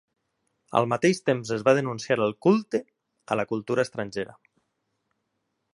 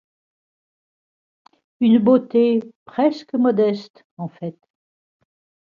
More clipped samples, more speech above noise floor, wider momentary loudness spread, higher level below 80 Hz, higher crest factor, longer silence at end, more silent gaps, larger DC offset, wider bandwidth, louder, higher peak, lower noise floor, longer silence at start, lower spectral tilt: neither; second, 53 dB vs over 72 dB; second, 9 LU vs 18 LU; about the same, -68 dBFS vs -70 dBFS; about the same, 22 dB vs 18 dB; first, 1.5 s vs 1.25 s; second, none vs 2.75-2.86 s, 3.90-3.94 s, 4.04-4.17 s; neither; first, 11.5 kHz vs 6.8 kHz; second, -25 LUFS vs -18 LUFS; about the same, -6 dBFS vs -4 dBFS; second, -78 dBFS vs under -90 dBFS; second, 0.7 s vs 1.8 s; second, -6 dB/octave vs -8.5 dB/octave